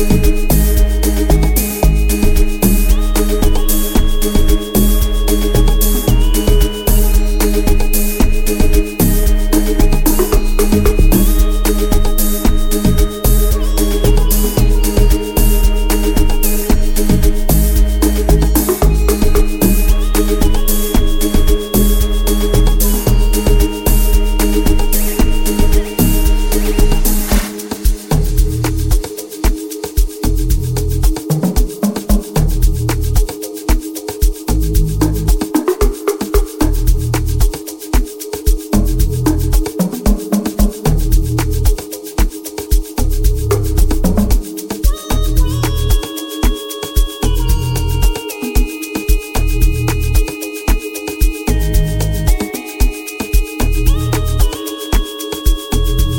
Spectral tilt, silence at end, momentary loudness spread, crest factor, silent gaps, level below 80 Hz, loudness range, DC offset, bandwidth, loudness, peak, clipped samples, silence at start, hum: -5.5 dB/octave; 0 s; 5 LU; 12 dB; none; -12 dBFS; 3 LU; under 0.1%; 17 kHz; -15 LUFS; 0 dBFS; under 0.1%; 0 s; none